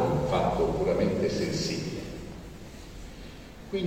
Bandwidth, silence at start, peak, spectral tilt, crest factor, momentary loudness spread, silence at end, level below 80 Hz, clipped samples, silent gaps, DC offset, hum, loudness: 16.5 kHz; 0 s; -14 dBFS; -6 dB/octave; 16 dB; 19 LU; 0 s; -44 dBFS; under 0.1%; none; under 0.1%; none; -28 LUFS